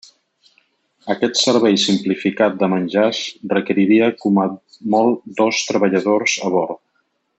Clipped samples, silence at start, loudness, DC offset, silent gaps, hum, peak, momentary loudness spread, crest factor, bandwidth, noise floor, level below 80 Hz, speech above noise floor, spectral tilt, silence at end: under 0.1%; 1.05 s; -17 LUFS; under 0.1%; none; none; -4 dBFS; 10 LU; 14 dB; 8.2 kHz; -67 dBFS; -66 dBFS; 50 dB; -4.5 dB/octave; 0.6 s